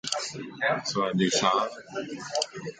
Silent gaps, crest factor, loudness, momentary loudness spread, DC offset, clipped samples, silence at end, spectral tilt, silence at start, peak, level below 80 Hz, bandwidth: none; 20 dB; -28 LUFS; 12 LU; under 0.1%; under 0.1%; 0.05 s; -3 dB/octave; 0.05 s; -8 dBFS; -68 dBFS; 9.4 kHz